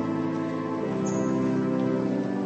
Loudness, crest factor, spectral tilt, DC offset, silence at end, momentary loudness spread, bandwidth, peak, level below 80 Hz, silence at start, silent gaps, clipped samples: -27 LUFS; 12 dB; -7.5 dB/octave; under 0.1%; 0 s; 4 LU; 8.4 kHz; -14 dBFS; -62 dBFS; 0 s; none; under 0.1%